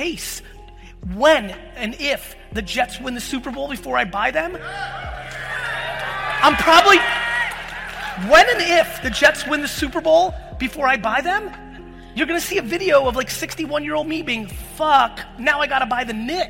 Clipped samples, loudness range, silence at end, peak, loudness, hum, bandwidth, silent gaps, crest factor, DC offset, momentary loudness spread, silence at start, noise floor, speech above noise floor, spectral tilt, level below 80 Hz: under 0.1%; 8 LU; 0 s; -2 dBFS; -18 LUFS; none; 16.5 kHz; none; 18 dB; under 0.1%; 16 LU; 0 s; -40 dBFS; 21 dB; -3 dB/octave; -40 dBFS